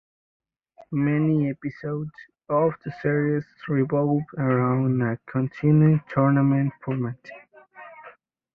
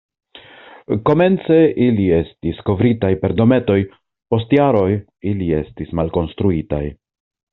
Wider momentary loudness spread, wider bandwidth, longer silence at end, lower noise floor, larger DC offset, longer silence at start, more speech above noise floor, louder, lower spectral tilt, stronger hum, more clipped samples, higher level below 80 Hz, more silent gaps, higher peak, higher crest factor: about the same, 12 LU vs 10 LU; first, 4.9 kHz vs 4.2 kHz; second, 0.45 s vs 0.6 s; first, -54 dBFS vs -42 dBFS; neither; first, 0.8 s vs 0.35 s; first, 31 dB vs 26 dB; second, -24 LUFS vs -17 LUFS; first, -11.5 dB/octave vs -7.5 dB/octave; neither; neither; second, -60 dBFS vs -42 dBFS; neither; second, -8 dBFS vs -2 dBFS; about the same, 16 dB vs 16 dB